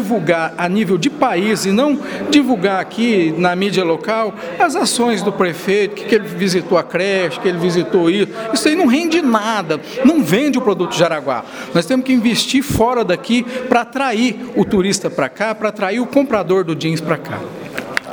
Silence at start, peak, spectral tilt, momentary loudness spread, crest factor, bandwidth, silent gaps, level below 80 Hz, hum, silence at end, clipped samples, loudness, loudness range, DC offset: 0 s; 0 dBFS; -5 dB/octave; 5 LU; 16 dB; over 20 kHz; none; -48 dBFS; none; 0 s; under 0.1%; -16 LUFS; 2 LU; under 0.1%